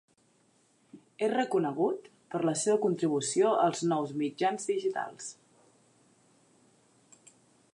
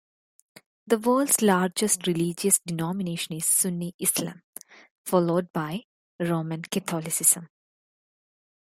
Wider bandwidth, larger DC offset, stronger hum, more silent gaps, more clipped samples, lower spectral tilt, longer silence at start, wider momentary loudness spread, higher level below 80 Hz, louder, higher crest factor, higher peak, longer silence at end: second, 11.5 kHz vs 16.5 kHz; neither; neither; second, none vs 3.94-3.99 s, 4.44-4.53 s, 4.91-5.05 s, 5.50-5.54 s, 5.84-6.19 s; neither; about the same, -4.5 dB/octave vs -4 dB/octave; about the same, 0.95 s vs 0.85 s; about the same, 11 LU vs 13 LU; second, -86 dBFS vs -68 dBFS; second, -30 LUFS vs -24 LUFS; about the same, 18 dB vs 22 dB; second, -14 dBFS vs -4 dBFS; first, 2.4 s vs 1.3 s